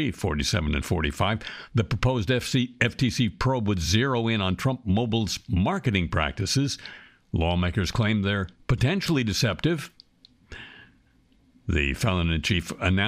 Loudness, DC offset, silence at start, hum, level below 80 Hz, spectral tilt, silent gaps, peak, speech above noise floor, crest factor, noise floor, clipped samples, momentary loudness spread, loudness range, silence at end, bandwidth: -25 LUFS; under 0.1%; 0 s; none; -38 dBFS; -5 dB/octave; none; -6 dBFS; 36 dB; 20 dB; -61 dBFS; under 0.1%; 7 LU; 4 LU; 0 s; 15.5 kHz